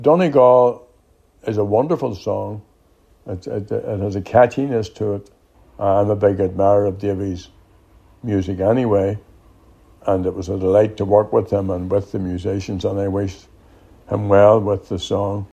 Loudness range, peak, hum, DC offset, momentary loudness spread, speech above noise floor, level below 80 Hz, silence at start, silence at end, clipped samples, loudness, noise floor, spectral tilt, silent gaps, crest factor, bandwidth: 4 LU; 0 dBFS; none; under 0.1%; 14 LU; 38 dB; -50 dBFS; 0 s; 0.05 s; under 0.1%; -18 LUFS; -55 dBFS; -8 dB/octave; none; 18 dB; 8.8 kHz